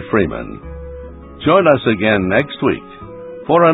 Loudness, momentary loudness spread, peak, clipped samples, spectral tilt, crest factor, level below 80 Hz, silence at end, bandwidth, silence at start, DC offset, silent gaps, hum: -15 LUFS; 21 LU; 0 dBFS; under 0.1%; -9.5 dB/octave; 16 dB; -38 dBFS; 0 s; 4 kHz; 0 s; under 0.1%; none; none